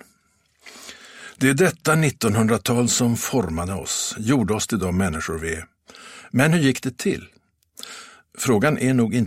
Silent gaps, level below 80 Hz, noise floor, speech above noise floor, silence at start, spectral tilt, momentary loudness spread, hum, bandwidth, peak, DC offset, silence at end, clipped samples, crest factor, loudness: none; -48 dBFS; -64 dBFS; 43 dB; 0.65 s; -5 dB/octave; 21 LU; none; 16 kHz; -2 dBFS; under 0.1%; 0 s; under 0.1%; 20 dB; -21 LUFS